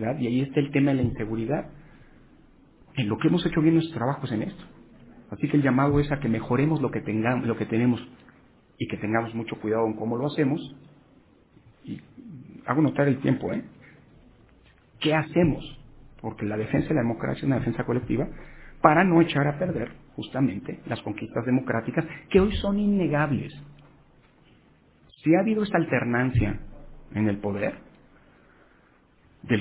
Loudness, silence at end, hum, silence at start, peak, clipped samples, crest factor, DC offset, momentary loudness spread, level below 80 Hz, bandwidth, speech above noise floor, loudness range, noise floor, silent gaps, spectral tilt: -25 LUFS; 0 s; none; 0 s; 0 dBFS; under 0.1%; 26 dB; under 0.1%; 14 LU; -46 dBFS; 4 kHz; 35 dB; 5 LU; -59 dBFS; none; -11.5 dB/octave